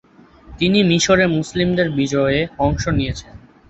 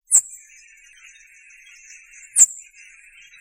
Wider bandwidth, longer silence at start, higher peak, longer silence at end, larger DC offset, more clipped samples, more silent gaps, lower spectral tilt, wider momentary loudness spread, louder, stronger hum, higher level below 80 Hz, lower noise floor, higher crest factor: second, 8.2 kHz vs 16 kHz; first, 0.5 s vs 0.1 s; about the same, -2 dBFS vs 0 dBFS; second, 0.35 s vs 0.85 s; neither; neither; neither; first, -5 dB/octave vs 4.5 dB/octave; second, 7 LU vs 24 LU; about the same, -17 LUFS vs -15 LUFS; neither; first, -36 dBFS vs -70 dBFS; second, -44 dBFS vs -49 dBFS; second, 16 dB vs 24 dB